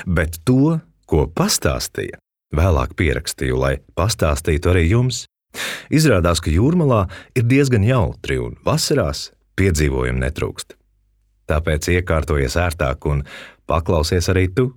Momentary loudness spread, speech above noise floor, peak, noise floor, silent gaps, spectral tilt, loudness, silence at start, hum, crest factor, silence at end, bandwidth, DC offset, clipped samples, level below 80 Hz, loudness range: 10 LU; 43 dB; -2 dBFS; -61 dBFS; none; -5.5 dB/octave; -19 LUFS; 0 s; none; 16 dB; 0.05 s; 18 kHz; under 0.1%; under 0.1%; -28 dBFS; 4 LU